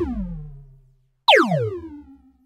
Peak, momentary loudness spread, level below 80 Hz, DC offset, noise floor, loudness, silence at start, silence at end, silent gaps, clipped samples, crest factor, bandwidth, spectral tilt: -2 dBFS; 22 LU; -40 dBFS; under 0.1%; -58 dBFS; -19 LUFS; 0 s; 0.35 s; none; under 0.1%; 22 dB; 16 kHz; -5 dB/octave